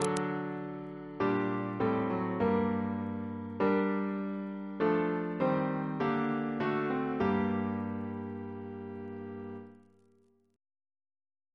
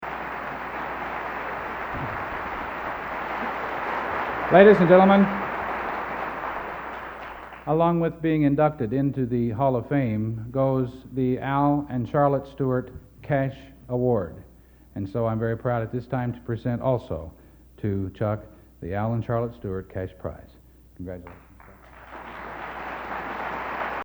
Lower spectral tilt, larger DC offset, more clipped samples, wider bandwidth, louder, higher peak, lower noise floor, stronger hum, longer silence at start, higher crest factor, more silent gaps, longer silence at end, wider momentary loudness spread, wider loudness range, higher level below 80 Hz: second, -7 dB/octave vs -9 dB/octave; neither; neither; second, 11 kHz vs over 20 kHz; second, -33 LUFS vs -25 LUFS; second, -12 dBFS vs 0 dBFS; first, -68 dBFS vs -49 dBFS; neither; about the same, 0 s vs 0 s; about the same, 20 dB vs 24 dB; neither; first, 1.8 s vs 0 s; about the same, 13 LU vs 15 LU; about the same, 10 LU vs 12 LU; second, -68 dBFS vs -50 dBFS